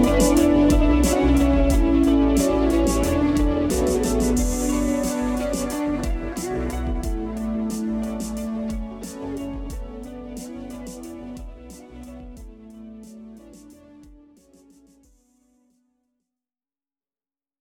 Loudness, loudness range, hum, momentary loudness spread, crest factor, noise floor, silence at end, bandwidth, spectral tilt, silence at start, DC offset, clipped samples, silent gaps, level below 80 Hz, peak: -22 LUFS; 22 LU; none; 23 LU; 18 dB; under -90 dBFS; 3.45 s; 18 kHz; -6 dB/octave; 0 s; under 0.1%; under 0.1%; none; -30 dBFS; -4 dBFS